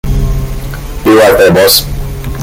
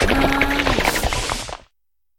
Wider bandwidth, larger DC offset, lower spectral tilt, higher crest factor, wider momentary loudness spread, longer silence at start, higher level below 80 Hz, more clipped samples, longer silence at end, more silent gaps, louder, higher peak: first, over 20 kHz vs 17.5 kHz; neither; about the same, -4.5 dB/octave vs -3.5 dB/octave; second, 8 dB vs 18 dB; first, 16 LU vs 13 LU; about the same, 0.05 s vs 0 s; first, -18 dBFS vs -28 dBFS; first, 0.6% vs under 0.1%; second, 0 s vs 0.6 s; neither; first, -7 LUFS vs -19 LUFS; about the same, 0 dBFS vs -2 dBFS